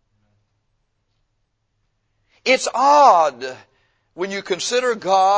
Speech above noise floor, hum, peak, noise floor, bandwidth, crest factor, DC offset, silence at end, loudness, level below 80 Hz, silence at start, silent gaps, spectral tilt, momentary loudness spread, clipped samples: 54 dB; none; 0 dBFS; -70 dBFS; 8 kHz; 20 dB; under 0.1%; 0 s; -17 LUFS; -68 dBFS; 2.45 s; none; -2 dB/octave; 16 LU; under 0.1%